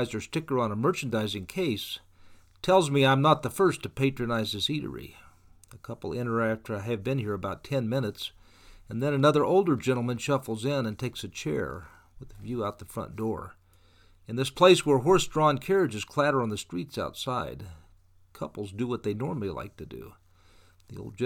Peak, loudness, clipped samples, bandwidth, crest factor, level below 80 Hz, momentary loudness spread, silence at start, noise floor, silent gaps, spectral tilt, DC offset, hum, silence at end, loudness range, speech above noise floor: -6 dBFS; -28 LUFS; under 0.1%; 18 kHz; 22 dB; -56 dBFS; 17 LU; 0 s; -59 dBFS; none; -5.5 dB/octave; under 0.1%; none; 0 s; 10 LU; 32 dB